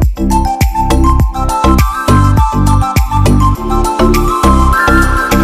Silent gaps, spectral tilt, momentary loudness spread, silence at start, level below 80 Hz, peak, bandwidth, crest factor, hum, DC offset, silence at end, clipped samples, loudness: none; -6 dB/octave; 4 LU; 0 s; -14 dBFS; 0 dBFS; 15.5 kHz; 8 dB; none; under 0.1%; 0 s; 1%; -10 LUFS